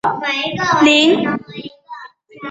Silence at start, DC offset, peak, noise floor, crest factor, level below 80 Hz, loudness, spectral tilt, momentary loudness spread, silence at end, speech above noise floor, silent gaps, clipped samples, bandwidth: 0.05 s; under 0.1%; 0 dBFS; -37 dBFS; 16 dB; -56 dBFS; -14 LUFS; -4 dB/octave; 24 LU; 0 s; 22 dB; none; under 0.1%; 8 kHz